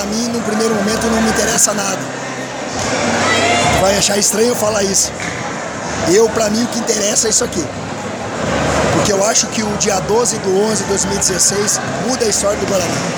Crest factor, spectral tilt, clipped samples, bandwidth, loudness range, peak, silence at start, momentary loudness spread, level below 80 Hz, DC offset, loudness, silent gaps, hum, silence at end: 16 dB; -3 dB/octave; under 0.1%; over 20 kHz; 2 LU; 0 dBFS; 0 s; 10 LU; -38 dBFS; under 0.1%; -14 LUFS; none; none; 0 s